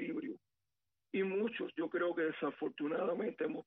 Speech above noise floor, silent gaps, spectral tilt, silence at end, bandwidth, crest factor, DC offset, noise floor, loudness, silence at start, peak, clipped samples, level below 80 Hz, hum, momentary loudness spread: over 52 dB; none; -4.5 dB/octave; 0.05 s; 4 kHz; 14 dB; under 0.1%; under -90 dBFS; -38 LUFS; 0 s; -26 dBFS; under 0.1%; -86 dBFS; none; 7 LU